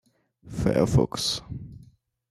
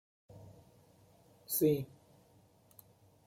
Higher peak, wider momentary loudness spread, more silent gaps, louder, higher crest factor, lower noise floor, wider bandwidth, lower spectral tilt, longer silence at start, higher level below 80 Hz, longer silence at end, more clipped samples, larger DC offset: first, -8 dBFS vs -18 dBFS; second, 18 LU vs 27 LU; neither; first, -25 LUFS vs -33 LUFS; about the same, 20 dB vs 22 dB; second, -55 dBFS vs -66 dBFS; second, 13.5 kHz vs 16.5 kHz; about the same, -5.5 dB/octave vs -6 dB/octave; about the same, 0.45 s vs 0.35 s; first, -44 dBFS vs -74 dBFS; second, 0.5 s vs 1.4 s; neither; neither